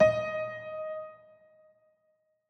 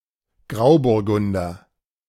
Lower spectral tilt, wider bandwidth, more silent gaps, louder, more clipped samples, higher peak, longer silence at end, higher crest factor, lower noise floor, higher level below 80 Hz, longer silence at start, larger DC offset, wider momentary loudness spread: second, -6 dB/octave vs -8 dB/octave; second, 6.2 kHz vs 15 kHz; neither; second, -33 LUFS vs -19 LUFS; neither; second, -10 dBFS vs -4 dBFS; first, 1.35 s vs 0.55 s; about the same, 22 dB vs 18 dB; first, -74 dBFS vs -53 dBFS; second, -64 dBFS vs -50 dBFS; second, 0 s vs 0.5 s; neither; about the same, 13 LU vs 15 LU